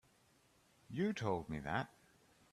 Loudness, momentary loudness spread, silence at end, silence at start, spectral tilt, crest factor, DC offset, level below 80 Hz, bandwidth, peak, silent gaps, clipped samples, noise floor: -41 LUFS; 9 LU; 0.65 s; 0.9 s; -6.5 dB/octave; 22 dB; under 0.1%; -68 dBFS; 13.5 kHz; -22 dBFS; none; under 0.1%; -72 dBFS